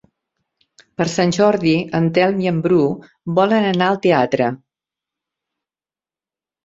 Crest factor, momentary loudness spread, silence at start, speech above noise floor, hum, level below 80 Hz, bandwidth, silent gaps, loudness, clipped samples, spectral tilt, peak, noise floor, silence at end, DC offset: 18 dB; 7 LU; 1 s; over 74 dB; none; -56 dBFS; 7.8 kHz; none; -17 LUFS; under 0.1%; -6 dB/octave; -2 dBFS; under -90 dBFS; 2.1 s; under 0.1%